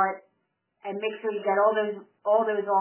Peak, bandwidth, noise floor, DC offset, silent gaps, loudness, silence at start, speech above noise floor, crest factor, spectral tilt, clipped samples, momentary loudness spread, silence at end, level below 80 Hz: -10 dBFS; 3.2 kHz; -76 dBFS; under 0.1%; none; -26 LUFS; 0 s; 50 dB; 16 dB; -8.5 dB/octave; under 0.1%; 14 LU; 0 s; under -90 dBFS